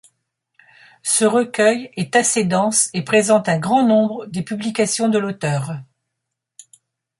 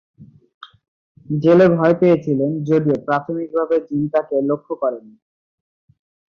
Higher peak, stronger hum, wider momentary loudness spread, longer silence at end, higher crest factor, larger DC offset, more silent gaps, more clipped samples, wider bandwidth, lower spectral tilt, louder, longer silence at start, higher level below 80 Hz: about the same, -2 dBFS vs -2 dBFS; neither; about the same, 9 LU vs 11 LU; about the same, 1.35 s vs 1.3 s; about the same, 16 dB vs 16 dB; neither; second, none vs 0.54-0.61 s, 0.88-1.15 s; neither; first, 12 kHz vs 6.8 kHz; second, -4 dB/octave vs -9.5 dB/octave; about the same, -18 LUFS vs -18 LUFS; first, 1.05 s vs 0.2 s; about the same, -64 dBFS vs -60 dBFS